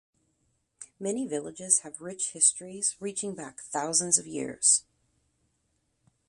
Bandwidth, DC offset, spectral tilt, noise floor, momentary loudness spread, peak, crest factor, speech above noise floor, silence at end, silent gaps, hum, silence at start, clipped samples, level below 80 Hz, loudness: 11.5 kHz; under 0.1%; -1.5 dB/octave; -75 dBFS; 14 LU; -8 dBFS; 24 dB; 46 dB; 1.45 s; none; none; 0.8 s; under 0.1%; -74 dBFS; -26 LUFS